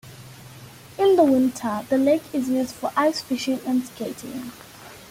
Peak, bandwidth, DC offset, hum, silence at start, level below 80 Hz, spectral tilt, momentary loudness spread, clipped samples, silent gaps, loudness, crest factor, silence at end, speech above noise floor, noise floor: -6 dBFS; 16.5 kHz; under 0.1%; none; 0.05 s; -60 dBFS; -5 dB/octave; 25 LU; under 0.1%; none; -22 LUFS; 16 dB; 0.05 s; 21 dB; -44 dBFS